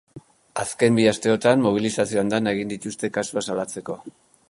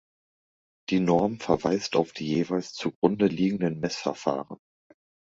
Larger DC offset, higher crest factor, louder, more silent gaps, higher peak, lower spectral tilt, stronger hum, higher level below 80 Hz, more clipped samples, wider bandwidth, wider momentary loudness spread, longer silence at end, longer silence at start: neither; about the same, 20 dB vs 22 dB; first, -22 LUFS vs -27 LUFS; second, none vs 2.95-3.02 s; first, -2 dBFS vs -6 dBFS; about the same, -5 dB/octave vs -6 dB/octave; neither; about the same, -60 dBFS vs -60 dBFS; neither; first, 11.5 kHz vs 7.8 kHz; first, 13 LU vs 9 LU; second, 0.4 s vs 0.75 s; second, 0.15 s vs 0.9 s